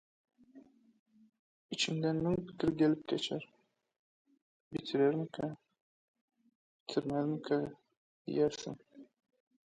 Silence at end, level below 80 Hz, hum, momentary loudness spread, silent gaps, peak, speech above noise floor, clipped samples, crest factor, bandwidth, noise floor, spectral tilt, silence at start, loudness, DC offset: 0.7 s; -68 dBFS; none; 15 LU; 0.99-1.06 s, 1.39-1.69 s, 3.99-4.25 s, 4.42-4.71 s, 5.81-6.14 s, 6.21-6.28 s, 6.55-6.86 s, 7.97-8.25 s; -18 dBFS; 27 dB; under 0.1%; 18 dB; 9.4 kHz; -61 dBFS; -5.5 dB/octave; 0.55 s; -35 LUFS; under 0.1%